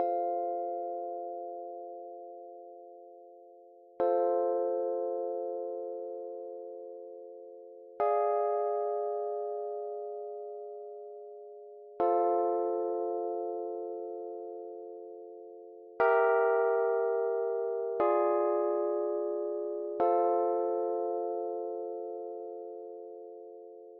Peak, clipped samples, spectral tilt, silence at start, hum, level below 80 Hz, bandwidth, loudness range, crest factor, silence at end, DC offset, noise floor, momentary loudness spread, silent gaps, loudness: -16 dBFS; under 0.1%; -4.5 dB/octave; 0 s; none; -86 dBFS; 4.1 kHz; 9 LU; 18 dB; 0 s; under 0.1%; -56 dBFS; 20 LU; none; -32 LUFS